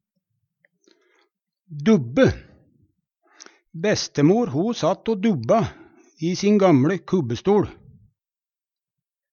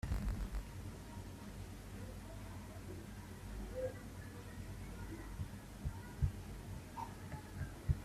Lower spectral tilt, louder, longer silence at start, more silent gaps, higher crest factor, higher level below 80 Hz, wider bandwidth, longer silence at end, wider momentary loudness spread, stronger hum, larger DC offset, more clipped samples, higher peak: about the same, -6.5 dB/octave vs -6.5 dB/octave; first, -21 LUFS vs -48 LUFS; first, 1.7 s vs 0.05 s; neither; about the same, 20 dB vs 24 dB; about the same, -52 dBFS vs -50 dBFS; second, 7.2 kHz vs 15.5 kHz; first, 1.6 s vs 0 s; first, 12 LU vs 9 LU; neither; neither; neither; first, -4 dBFS vs -22 dBFS